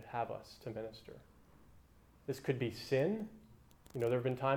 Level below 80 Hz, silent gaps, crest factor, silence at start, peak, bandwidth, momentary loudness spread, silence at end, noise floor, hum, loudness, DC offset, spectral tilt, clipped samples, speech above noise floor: -68 dBFS; none; 20 dB; 0 s; -20 dBFS; 19.5 kHz; 16 LU; 0 s; -64 dBFS; none; -39 LUFS; under 0.1%; -7 dB/octave; under 0.1%; 26 dB